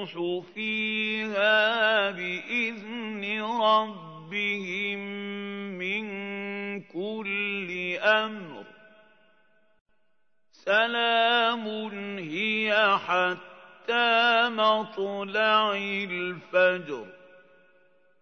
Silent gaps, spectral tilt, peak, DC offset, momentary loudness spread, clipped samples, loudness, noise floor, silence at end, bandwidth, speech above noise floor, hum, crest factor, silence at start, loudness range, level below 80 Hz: 9.81-9.86 s; -4.5 dB/octave; -8 dBFS; under 0.1%; 13 LU; under 0.1%; -26 LUFS; -77 dBFS; 1.05 s; 6.6 kHz; 51 dB; none; 20 dB; 0 s; 7 LU; -82 dBFS